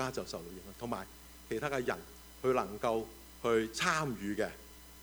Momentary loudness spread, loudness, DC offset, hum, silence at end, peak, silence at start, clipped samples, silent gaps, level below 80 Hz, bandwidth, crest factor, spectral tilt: 17 LU; -36 LUFS; under 0.1%; none; 0 s; -14 dBFS; 0 s; under 0.1%; none; -58 dBFS; over 20 kHz; 22 dB; -4.5 dB/octave